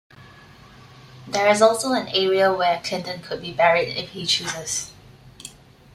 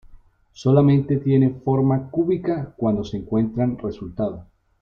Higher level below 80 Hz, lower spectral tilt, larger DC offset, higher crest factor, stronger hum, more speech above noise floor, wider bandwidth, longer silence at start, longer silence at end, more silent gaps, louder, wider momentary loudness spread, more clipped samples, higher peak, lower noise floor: second, -58 dBFS vs -48 dBFS; second, -2.5 dB/octave vs -9.5 dB/octave; neither; about the same, 20 dB vs 16 dB; neither; about the same, 26 dB vs 28 dB; first, 15 kHz vs 6.8 kHz; about the same, 0.2 s vs 0.1 s; about the same, 0.45 s vs 0.4 s; neither; about the same, -21 LUFS vs -21 LUFS; first, 19 LU vs 11 LU; neither; about the same, -2 dBFS vs -4 dBFS; about the same, -47 dBFS vs -48 dBFS